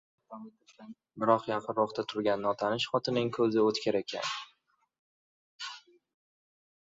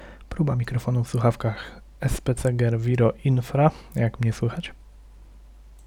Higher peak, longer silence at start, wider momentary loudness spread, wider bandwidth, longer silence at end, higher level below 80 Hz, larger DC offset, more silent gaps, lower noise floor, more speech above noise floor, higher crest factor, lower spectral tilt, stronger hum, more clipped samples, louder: second, -10 dBFS vs -6 dBFS; first, 0.3 s vs 0 s; first, 22 LU vs 11 LU; second, 7.8 kHz vs 14 kHz; first, 1.05 s vs 0.1 s; second, -74 dBFS vs -42 dBFS; neither; first, 4.99-5.59 s vs none; first, -72 dBFS vs -47 dBFS; first, 41 dB vs 24 dB; about the same, 22 dB vs 18 dB; second, -5 dB/octave vs -7.5 dB/octave; neither; neither; second, -30 LUFS vs -24 LUFS